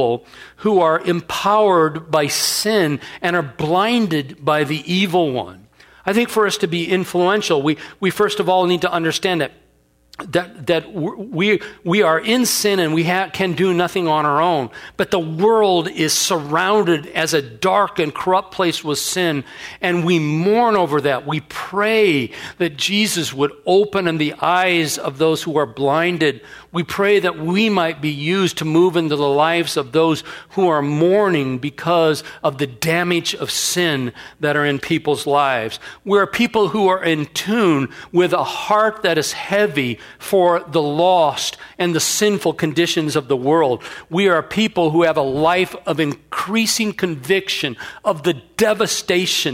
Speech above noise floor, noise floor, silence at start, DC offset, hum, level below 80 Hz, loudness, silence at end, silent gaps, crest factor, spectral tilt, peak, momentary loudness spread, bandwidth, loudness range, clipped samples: 39 dB; -57 dBFS; 0 s; under 0.1%; none; -56 dBFS; -18 LUFS; 0 s; none; 16 dB; -4 dB/octave; 0 dBFS; 7 LU; 16 kHz; 2 LU; under 0.1%